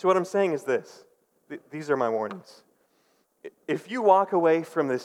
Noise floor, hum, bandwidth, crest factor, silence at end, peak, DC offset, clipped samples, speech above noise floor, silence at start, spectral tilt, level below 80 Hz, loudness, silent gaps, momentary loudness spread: -68 dBFS; none; 13.5 kHz; 20 dB; 0 s; -6 dBFS; under 0.1%; under 0.1%; 43 dB; 0.05 s; -6 dB/octave; under -90 dBFS; -25 LUFS; none; 22 LU